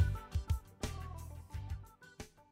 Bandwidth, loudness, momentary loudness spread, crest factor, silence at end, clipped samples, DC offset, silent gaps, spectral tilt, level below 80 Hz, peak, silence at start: 16 kHz; -43 LUFS; 14 LU; 20 dB; 0.1 s; under 0.1%; under 0.1%; none; -5.5 dB/octave; -44 dBFS; -20 dBFS; 0 s